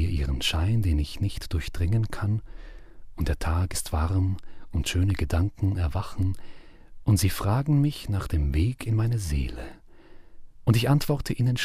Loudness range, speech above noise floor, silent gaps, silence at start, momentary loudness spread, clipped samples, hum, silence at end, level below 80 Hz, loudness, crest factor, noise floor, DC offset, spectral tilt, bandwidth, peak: 3 LU; 21 dB; none; 0 s; 8 LU; under 0.1%; none; 0 s; -34 dBFS; -27 LUFS; 18 dB; -46 dBFS; under 0.1%; -6 dB/octave; 15.5 kHz; -8 dBFS